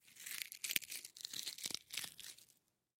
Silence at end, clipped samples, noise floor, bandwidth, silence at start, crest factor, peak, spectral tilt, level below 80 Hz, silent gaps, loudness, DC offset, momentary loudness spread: 0.55 s; under 0.1%; -76 dBFS; 16.5 kHz; 0.05 s; 36 dB; -12 dBFS; 1.5 dB/octave; -86 dBFS; none; -44 LUFS; under 0.1%; 12 LU